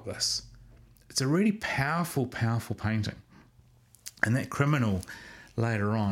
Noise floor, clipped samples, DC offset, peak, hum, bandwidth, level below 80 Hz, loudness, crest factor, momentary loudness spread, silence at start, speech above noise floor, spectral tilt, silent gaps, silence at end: -60 dBFS; under 0.1%; under 0.1%; -6 dBFS; none; 16.5 kHz; -56 dBFS; -29 LUFS; 24 dB; 12 LU; 0 s; 31 dB; -5 dB/octave; none; 0 s